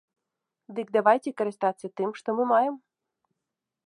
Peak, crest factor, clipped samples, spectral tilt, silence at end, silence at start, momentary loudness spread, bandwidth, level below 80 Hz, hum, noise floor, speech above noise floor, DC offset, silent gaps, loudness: -6 dBFS; 22 dB; under 0.1%; -6 dB/octave; 1.1 s; 0.7 s; 13 LU; 11.5 kHz; -82 dBFS; none; -86 dBFS; 61 dB; under 0.1%; none; -26 LUFS